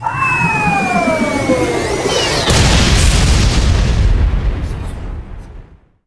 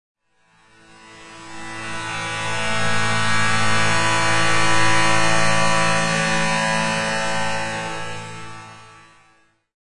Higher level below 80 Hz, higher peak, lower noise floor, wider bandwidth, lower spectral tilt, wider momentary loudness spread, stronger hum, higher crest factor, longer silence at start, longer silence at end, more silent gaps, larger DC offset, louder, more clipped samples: first, -18 dBFS vs -48 dBFS; first, 0 dBFS vs -4 dBFS; second, -38 dBFS vs -59 dBFS; about the same, 11 kHz vs 11.5 kHz; first, -4.5 dB/octave vs -3 dB/octave; second, 15 LU vs 18 LU; neither; about the same, 14 dB vs 16 dB; second, 0 s vs 0.15 s; first, 0.45 s vs 0.15 s; neither; neither; first, -13 LUFS vs -19 LUFS; neither